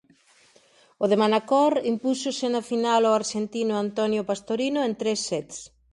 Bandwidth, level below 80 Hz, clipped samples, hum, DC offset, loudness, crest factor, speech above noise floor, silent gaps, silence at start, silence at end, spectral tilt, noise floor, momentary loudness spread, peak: 11.5 kHz; -68 dBFS; under 0.1%; none; under 0.1%; -24 LUFS; 16 dB; 35 dB; none; 1 s; 0.25 s; -4 dB/octave; -59 dBFS; 8 LU; -8 dBFS